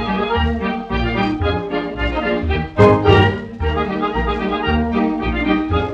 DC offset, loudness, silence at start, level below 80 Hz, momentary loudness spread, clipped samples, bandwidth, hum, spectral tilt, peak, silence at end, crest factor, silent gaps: under 0.1%; -18 LUFS; 0 s; -28 dBFS; 9 LU; under 0.1%; 8 kHz; none; -8 dB/octave; 0 dBFS; 0 s; 16 dB; none